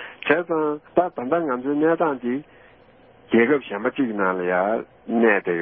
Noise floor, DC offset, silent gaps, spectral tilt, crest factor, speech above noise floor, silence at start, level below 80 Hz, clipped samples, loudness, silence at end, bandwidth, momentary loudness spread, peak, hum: -52 dBFS; under 0.1%; none; -10.5 dB/octave; 22 dB; 30 dB; 0 s; -66 dBFS; under 0.1%; -22 LUFS; 0 s; 3.7 kHz; 8 LU; 0 dBFS; none